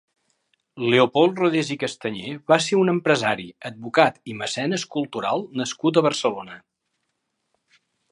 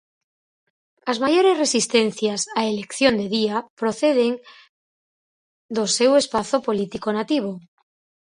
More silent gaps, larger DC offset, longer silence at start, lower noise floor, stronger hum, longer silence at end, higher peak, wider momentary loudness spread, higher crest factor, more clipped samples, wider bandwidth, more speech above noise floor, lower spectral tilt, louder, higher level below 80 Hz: second, none vs 3.70-3.77 s, 4.69-5.69 s; neither; second, 0.75 s vs 1.05 s; second, -76 dBFS vs under -90 dBFS; neither; first, 1.55 s vs 0.7 s; about the same, -2 dBFS vs -2 dBFS; about the same, 11 LU vs 9 LU; about the same, 22 dB vs 20 dB; neither; about the same, 11 kHz vs 11 kHz; second, 54 dB vs over 70 dB; about the same, -4.5 dB/octave vs -3.5 dB/octave; about the same, -22 LUFS vs -21 LUFS; second, -68 dBFS vs -62 dBFS